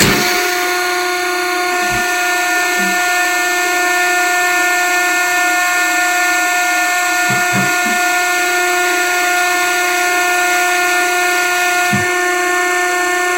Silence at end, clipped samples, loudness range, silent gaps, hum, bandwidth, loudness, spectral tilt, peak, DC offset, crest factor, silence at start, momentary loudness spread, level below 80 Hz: 0 s; under 0.1%; 1 LU; none; none; 16.5 kHz; -13 LUFS; -1.5 dB/octave; 0 dBFS; 0.2%; 14 dB; 0 s; 2 LU; -48 dBFS